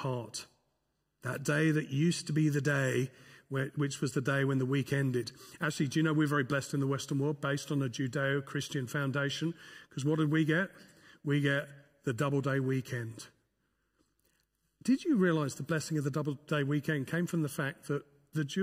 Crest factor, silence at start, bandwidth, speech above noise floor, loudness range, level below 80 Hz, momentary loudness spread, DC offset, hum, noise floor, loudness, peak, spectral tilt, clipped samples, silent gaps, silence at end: 16 dB; 0 s; 16 kHz; 48 dB; 3 LU; -74 dBFS; 10 LU; under 0.1%; none; -80 dBFS; -33 LUFS; -16 dBFS; -6 dB/octave; under 0.1%; none; 0 s